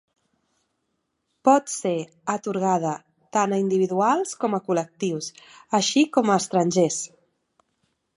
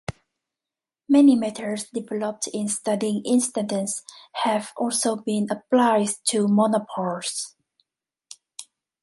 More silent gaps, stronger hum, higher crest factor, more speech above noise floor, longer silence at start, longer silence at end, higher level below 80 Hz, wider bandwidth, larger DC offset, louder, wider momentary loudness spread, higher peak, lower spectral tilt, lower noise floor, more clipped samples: neither; neither; about the same, 20 dB vs 18 dB; second, 53 dB vs 67 dB; first, 1.45 s vs 0.1 s; first, 1.1 s vs 0.4 s; second, -74 dBFS vs -62 dBFS; about the same, 11.5 kHz vs 11.5 kHz; neither; about the same, -23 LUFS vs -23 LUFS; second, 10 LU vs 14 LU; about the same, -4 dBFS vs -6 dBFS; about the same, -4.5 dB/octave vs -4.5 dB/octave; second, -76 dBFS vs -89 dBFS; neither